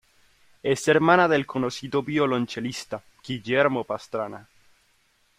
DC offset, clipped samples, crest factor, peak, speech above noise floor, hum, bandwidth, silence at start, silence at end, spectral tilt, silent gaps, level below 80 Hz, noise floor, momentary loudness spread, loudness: under 0.1%; under 0.1%; 22 dB; -4 dBFS; 41 dB; none; 15.5 kHz; 0.65 s; 0.95 s; -5 dB/octave; none; -64 dBFS; -65 dBFS; 16 LU; -24 LUFS